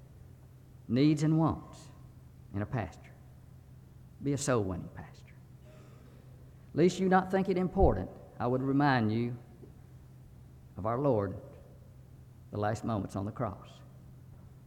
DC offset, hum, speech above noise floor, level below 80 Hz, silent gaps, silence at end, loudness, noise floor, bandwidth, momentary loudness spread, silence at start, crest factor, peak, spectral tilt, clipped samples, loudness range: under 0.1%; none; 24 dB; -48 dBFS; none; 0.05 s; -31 LUFS; -54 dBFS; 15.5 kHz; 26 LU; 0 s; 22 dB; -12 dBFS; -7 dB/octave; under 0.1%; 9 LU